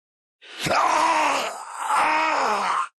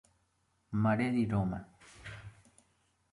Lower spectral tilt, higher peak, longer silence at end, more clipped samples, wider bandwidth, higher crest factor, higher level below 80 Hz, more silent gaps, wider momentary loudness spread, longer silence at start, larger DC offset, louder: second, -2 dB/octave vs -8 dB/octave; first, -10 dBFS vs -18 dBFS; second, 0.1 s vs 0.8 s; neither; about the same, 12.5 kHz vs 11.5 kHz; second, 12 dB vs 18 dB; about the same, -62 dBFS vs -58 dBFS; neither; second, 11 LU vs 21 LU; second, 0.45 s vs 0.7 s; neither; first, -22 LUFS vs -33 LUFS